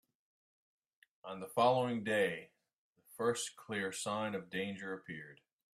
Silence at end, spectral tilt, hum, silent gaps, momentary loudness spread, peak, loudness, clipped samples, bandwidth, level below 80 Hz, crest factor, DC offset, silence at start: 0.4 s; -4 dB/octave; none; 2.75-2.93 s; 17 LU; -18 dBFS; -37 LUFS; under 0.1%; 15.5 kHz; -82 dBFS; 20 dB; under 0.1%; 1.25 s